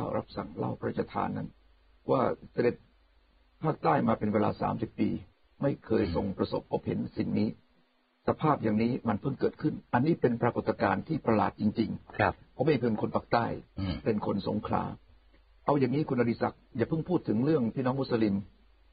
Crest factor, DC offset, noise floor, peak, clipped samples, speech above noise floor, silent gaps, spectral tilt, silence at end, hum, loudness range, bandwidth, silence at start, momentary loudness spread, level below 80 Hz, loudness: 20 dB; under 0.1%; -69 dBFS; -10 dBFS; under 0.1%; 40 dB; none; -6.5 dB/octave; 0.45 s; none; 3 LU; 5 kHz; 0 s; 8 LU; -56 dBFS; -30 LUFS